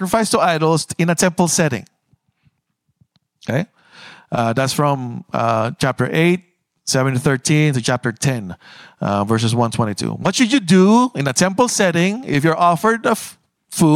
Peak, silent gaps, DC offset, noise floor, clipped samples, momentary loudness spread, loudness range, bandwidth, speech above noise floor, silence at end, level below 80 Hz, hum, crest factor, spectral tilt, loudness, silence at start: -2 dBFS; none; under 0.1%; -70 dBFS; under 0.1%; 10 LU; 7 LU; 16.5 kHz; 53 dB; 0 s; -54 dBFS; none; 14 dB; -5 dB/octave; -17 LUFS; 0 s